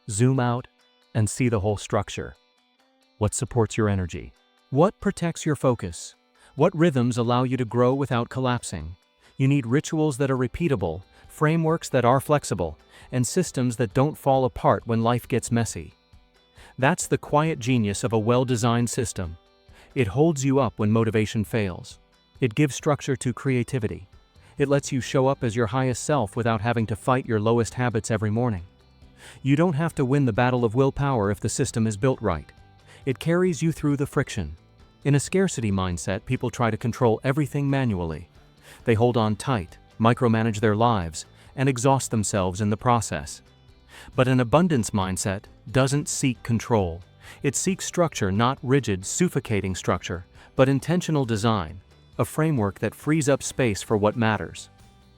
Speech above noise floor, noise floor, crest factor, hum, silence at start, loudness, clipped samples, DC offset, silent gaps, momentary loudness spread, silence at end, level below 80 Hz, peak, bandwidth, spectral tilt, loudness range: 41 dB; -64 dBFS; 20 dB; none; 0.05 s; -24 LUFS; under 0.1%; under 0.1%; none; 10 LU; 0.55 s; -50 dBFS; -4 dBFS; 16.5 kHz; -6 dB/octave; 2 LU